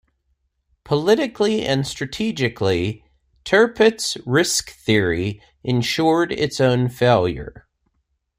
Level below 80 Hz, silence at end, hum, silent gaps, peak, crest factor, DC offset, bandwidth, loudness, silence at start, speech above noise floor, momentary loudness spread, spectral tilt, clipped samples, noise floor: -48 dBFS; 0.9 s; none; none; -2 dBFS; 18 dB; under 0.1%; 16 kHz; -19 LUFS; 0.9 s; 52 dB; 10 LU; -4.5 dB/octave; under 0.1%; -71 dBFS